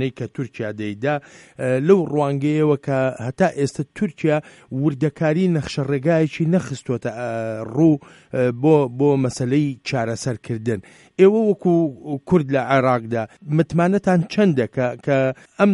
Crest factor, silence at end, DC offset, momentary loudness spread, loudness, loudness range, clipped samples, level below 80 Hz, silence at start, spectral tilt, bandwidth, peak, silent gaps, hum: 18 dB; 0 s; under 0.1%; 10 LU; -20 LUFS; 2 LU; under 0.1%; -56 dBFS; 0 s; -7.5 dB/octave; 11.5 kHz; -2 dBFS; none; none